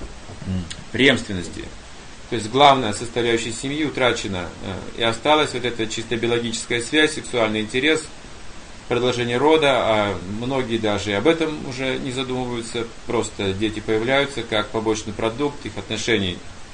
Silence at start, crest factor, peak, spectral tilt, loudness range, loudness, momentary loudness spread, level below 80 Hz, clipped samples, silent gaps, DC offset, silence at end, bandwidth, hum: 0 s; 22 dB; 0 dBFS; -4 dB/octave; 3 LU; -21 LUFS; 15 LU; -44 dBFS; under 0.1%; none; under 0.1%; 0 s; 10 kHz; none